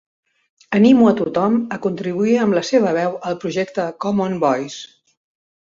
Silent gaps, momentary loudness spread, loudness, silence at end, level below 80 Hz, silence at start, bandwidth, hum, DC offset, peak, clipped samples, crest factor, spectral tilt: none; 10 LU; -18 LUFS; 0.75 s; -60 dBFS; 0.7 s; 7.6 kHz; none; under 0.1%; -2 dBFS; under 0.1%; 16 dB; -6.5 dB/octave